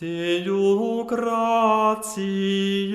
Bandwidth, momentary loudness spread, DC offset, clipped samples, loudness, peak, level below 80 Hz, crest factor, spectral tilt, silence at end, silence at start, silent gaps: 15 kHz; 6 LU; under 0.1%; under 0.1%; -22 LUFS; -8 dBFS; -64 dBFS; 14 dB; -5 dB/octave; 0 s; 0 s; none